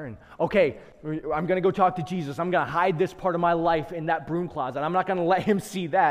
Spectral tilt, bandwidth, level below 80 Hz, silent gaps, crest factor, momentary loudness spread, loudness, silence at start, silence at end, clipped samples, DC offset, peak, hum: -6.5 dB/octave; 16 kHz; -54 dBFS; none; 16 dB; 8 LU; -25 LUFS; 0 s; 0 s; under 0.1%; under 0.1%; -8 dBFS; none